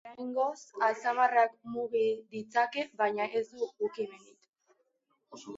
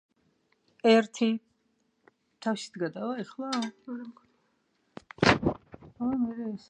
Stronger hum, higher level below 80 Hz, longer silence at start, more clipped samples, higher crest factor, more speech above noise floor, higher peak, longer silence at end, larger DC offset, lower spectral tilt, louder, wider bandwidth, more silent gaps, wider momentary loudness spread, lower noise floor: neither; second, -82 dBFS vs -56 dBFS; second, 0.05 s vs 0.85 s; neither; second, 20 dB vs 26 dB; about the same, 46 dB vs 44 dB; second, -12 dBFS vs -4 dBFS; about the same, 0 s vs 0.1 s; neither; about the same, -4 dB/octave vs -5 dB/octave; second, -32 LUFS vs -29 LUFS; second, 7.8 kHz vs 9.8 kHz; first, 4.49-4.53 s vs none; second, 11 LU vs 18 LU; first, -77 dBFS vs -73 dBFS